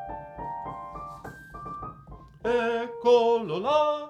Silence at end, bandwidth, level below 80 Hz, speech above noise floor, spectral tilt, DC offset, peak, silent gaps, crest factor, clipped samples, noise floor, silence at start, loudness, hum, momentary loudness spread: 0 s; 8.4 kHz; -54 dBFS; 24 dB; -5.5 dB/octave; under 0.1%; -10 dBFS; none; 18 dB; under 0.1%; -47 dBFS; 0 s; -26 LUFS; none; 20 LU